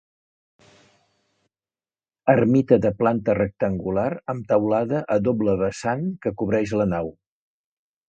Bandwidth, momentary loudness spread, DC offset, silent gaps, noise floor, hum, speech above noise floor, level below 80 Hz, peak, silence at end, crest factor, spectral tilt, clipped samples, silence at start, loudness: 9 kHz; 9 LU; under 0.1%; none; under -90 dBFS; none; over 69 dB; -50 dBFS; -2 dBFS; 1 s; 20 dB; -8 dB/octave; under 0.1%; 2.25 s; -22 LUFS